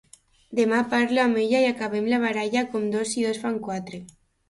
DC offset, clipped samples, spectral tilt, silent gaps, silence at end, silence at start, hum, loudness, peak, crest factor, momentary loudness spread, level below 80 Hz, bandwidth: under 0.1%; under 0.1%; -4.5 dB/octave; none; 0.45 s; 0.5 s; none; -24 LUFS; -10 dBFS; 14 dB; 10 LU; -64 dBFS; 11.5 kHz